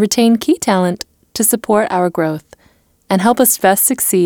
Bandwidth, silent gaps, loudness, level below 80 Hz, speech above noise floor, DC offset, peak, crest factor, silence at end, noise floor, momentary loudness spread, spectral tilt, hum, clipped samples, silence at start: over 20 kHz; none; -13 LUFS; -54 dBFS; 40 dB; under 0.1%; -2 dBFS; 14 dB; 0 s; -54 dBFS; 9 LU; -4 dB/octave; none; under 0.1%; 0 s